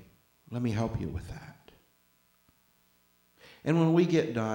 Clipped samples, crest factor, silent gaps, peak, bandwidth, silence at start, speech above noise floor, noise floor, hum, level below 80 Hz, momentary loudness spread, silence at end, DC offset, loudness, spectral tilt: under 0.1%; 20 dB; none; -12 dBFS; 16.5 kHz; 0.5 s; 40 dB; -68 dBFS; 60 Hz at -65 dBFS; -54 dBFS; 21 LU; 0 s; under 0.1%; -29 LUFS; -7.5 dB/octave